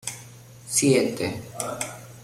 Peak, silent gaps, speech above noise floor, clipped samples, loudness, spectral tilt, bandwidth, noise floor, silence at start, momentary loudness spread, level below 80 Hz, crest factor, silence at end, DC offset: -6 dBFS; none; 21 dB; under 0.1%; -25 LUFS; -4 dB/octave; 16.5 kHz; -45 dBFS; 0.05 s; 17 LU; -60 dBFS; 20 dB; 0 s; under 0.1%